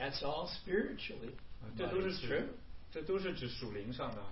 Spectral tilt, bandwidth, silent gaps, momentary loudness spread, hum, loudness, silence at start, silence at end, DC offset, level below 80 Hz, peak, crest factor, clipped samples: -3.5 dB/octave; 5.8 kHz; none; 12 LU; none; -40 LUFS; 0 s; 0 s; 0.3%; -54 dBFS; -22 dBFS; 18 dB; under 0.1%